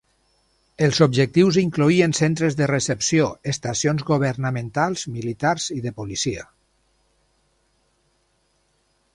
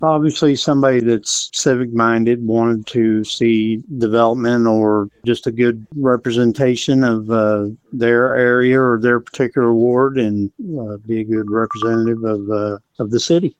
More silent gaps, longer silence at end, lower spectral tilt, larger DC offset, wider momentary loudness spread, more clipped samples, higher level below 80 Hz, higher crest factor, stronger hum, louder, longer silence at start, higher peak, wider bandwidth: neither; first, 2.7 s vs 0.1 s; about the same, -5 dB/octave vs -5.5 dB/octave; neither; first, 10 LU vs 7 LU; neither; about the same, -54 dBFS vs -56 dBFS; first, 20 dB vs 14 dB; neither; second, -21 LUFS vs -16 LUFS; first, 0.8 s vs 0 s; about the same, -2 dBFS vs -2 dBFS; first, 11.5 kHz vs 9.6 kHz